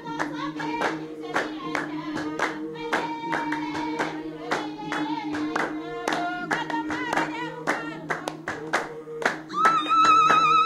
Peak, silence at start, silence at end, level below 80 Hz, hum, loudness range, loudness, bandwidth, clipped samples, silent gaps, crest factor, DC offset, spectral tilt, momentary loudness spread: -6 dBFS; 0 s; 0 s; -62 dBFS; none; 6 LU; -26 LUFS; 13.5 kHz; under 0.1%; none; 20 dB; under 0.1%; -4 dB/octave; 12 LU